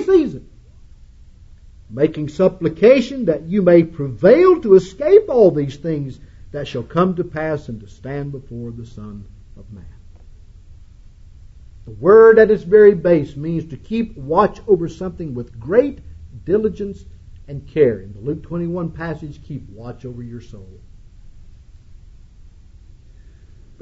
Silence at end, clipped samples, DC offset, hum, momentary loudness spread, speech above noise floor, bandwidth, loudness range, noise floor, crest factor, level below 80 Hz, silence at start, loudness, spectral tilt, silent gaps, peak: 2.4 s; under 0.1%; under 0.1%; none; 22 LU; 27 dB; 7.6 kHz; 18 LU; -43 dBFS; 18 dB; -42 dBFS; 0 s; -16 LUFS; -8.5 dB/octave; none; 0 dBFS